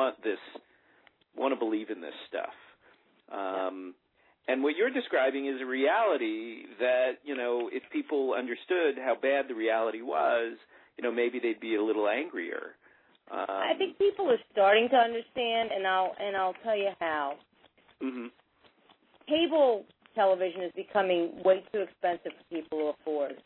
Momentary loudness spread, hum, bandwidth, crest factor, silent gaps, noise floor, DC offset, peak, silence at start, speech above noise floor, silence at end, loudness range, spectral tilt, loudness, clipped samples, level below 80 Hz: 13 LU; none; 4.2 kHz; 18 dB; none; -64 dBFS; under 0.1%; -12 dBFS; 0 s; 35 dB; 0.05 s; 7 LU; -7.5 dB/octave; -30 LUFS; under 0.1%; -78 dBFS